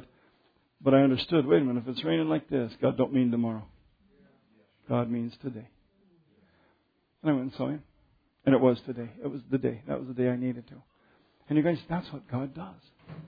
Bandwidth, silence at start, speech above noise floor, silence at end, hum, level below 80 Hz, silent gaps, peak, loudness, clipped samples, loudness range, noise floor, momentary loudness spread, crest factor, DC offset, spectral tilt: 5 kHz; 0.8 s; 44 dB; 0 s; none; -64 dBFS; none; -8 dBFS; -29 LUFS; under 0.1%; 10 LU; -72 dBFS; 15 LU; 20 dB; under 0.1%; -10 dB/octave